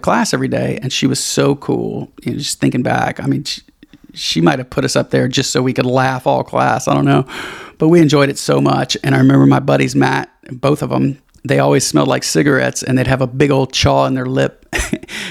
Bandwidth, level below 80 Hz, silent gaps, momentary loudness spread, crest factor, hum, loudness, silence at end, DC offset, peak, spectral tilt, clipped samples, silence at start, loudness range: 15 kHz; -40 dBFS; none; 9 LU; 14 dB; none; -14 LUFS; 0 s; under 0.1%; 0 dBFS; -5 dB/octave; under 0.1%; 0.05 s; 4 LU